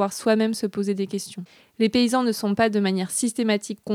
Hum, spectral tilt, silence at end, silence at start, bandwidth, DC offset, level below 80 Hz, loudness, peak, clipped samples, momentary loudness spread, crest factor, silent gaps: none; -4.5 dB/octave; 0 s; 0 s; 15.5 kHz; under 0.1%; -62 dBFS; -23 LUFS; -8 dBFS; under 0.1%; 10 LU; 14 dB; none